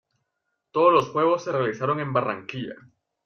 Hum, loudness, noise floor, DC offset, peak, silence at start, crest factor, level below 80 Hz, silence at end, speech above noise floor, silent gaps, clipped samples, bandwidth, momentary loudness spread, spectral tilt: none; -23 LUFS; -79 dBFS; under 0.1%; -6 dBFS; 0.75 s; 18 dB; -66 dBFS; 0.5 s; 56 dB; none; under 0.1%; 6.8 kHz; 15 LU; -6.5 dB/octave